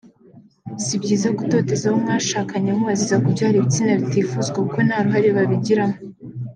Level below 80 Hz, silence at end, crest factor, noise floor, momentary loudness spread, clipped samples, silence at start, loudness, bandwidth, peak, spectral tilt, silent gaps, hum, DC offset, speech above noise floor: -62 dBFS; 0 s; 14 dB; -48 dBFS; 7 LU; under 0.1%; 0.35 s; -19 LUFS; 10 kHz; -6 dBFS; -5.5 dB/octave; none; none; under 0.1%; 30 dB